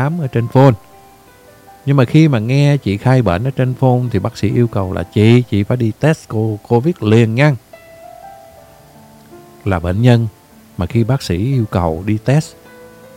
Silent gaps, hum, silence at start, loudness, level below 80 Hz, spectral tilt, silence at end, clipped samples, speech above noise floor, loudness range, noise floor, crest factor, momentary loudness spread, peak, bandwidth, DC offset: none; none; 0 s; -14 LUFS; -42 dBFS; -8 dB/octave; 0.3 s; under 0.1%; 30 dB; 4 LU; -43 dBFS; 14 dB; 8 LU; 0 dBFS; 15.5 kHz; under 0.1%